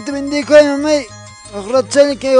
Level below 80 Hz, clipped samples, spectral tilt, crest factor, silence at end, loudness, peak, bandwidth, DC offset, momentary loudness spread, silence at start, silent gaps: -48 dBFS; under 0.1%; -3.5 dB/octave; 12 dB; 0 s; -13 LUFS; 0 dBFS; 10 kHz; under 0.1%; 19 LU; 0 s; none